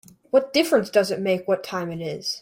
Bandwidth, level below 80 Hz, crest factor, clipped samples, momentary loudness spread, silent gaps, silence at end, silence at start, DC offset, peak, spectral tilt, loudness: 16.5 kHz; -64 dBFS; 16 dB; under 0.1%; 9 LU; none; 0 s; 0.35 s; under 0.1%; -6 dBFS; -4.5 dB/octave; -23 LUFS